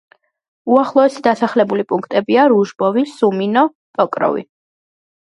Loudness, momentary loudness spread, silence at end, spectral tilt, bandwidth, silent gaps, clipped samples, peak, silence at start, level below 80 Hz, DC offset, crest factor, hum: -15 LUFS; 7 LU; 0.9 s; -6.5 dB/octave; 11 kHz; 3.75-3.94 s; under 0.1%; 0 dBFS; 0.65 s; -66 dBFS; under 0.1%; 16 dB; none